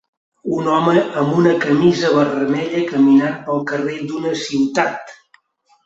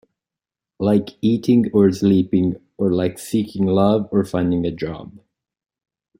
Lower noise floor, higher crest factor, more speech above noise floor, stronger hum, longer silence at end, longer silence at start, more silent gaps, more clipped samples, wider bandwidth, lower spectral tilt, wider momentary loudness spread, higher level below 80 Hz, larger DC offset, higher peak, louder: second, -59 dBFS vs -88 dBFS; about the same, 16 dB vs 16 dB; second, 43 dB vs 70 dB; neither; second, 0.7 s vs 1.1 s; second, 0.45 s vs 0.8 s; neither; neither; second, 8 kHz vs 15.5 kHz; second, -6 dB/octave vs -8 dB/octave; about the same, 9 LU vs 8 LU; about the same, -58 dBFS vs -54 dBFS; neither; about the same, -2 dBFS vs -4 dBFS; about the same, -17 LUFS vs -19 LUFS